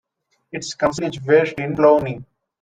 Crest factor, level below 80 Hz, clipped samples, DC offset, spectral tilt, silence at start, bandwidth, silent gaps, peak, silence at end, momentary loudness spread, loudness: 18 dB; -54 dBFS; under 0.1%; under 0.1%; -5.5 dB/octave; 0.55 s; 9.4 kHz; none; -2 dBFS; 0.4 s; 15 LU; -18 LUFS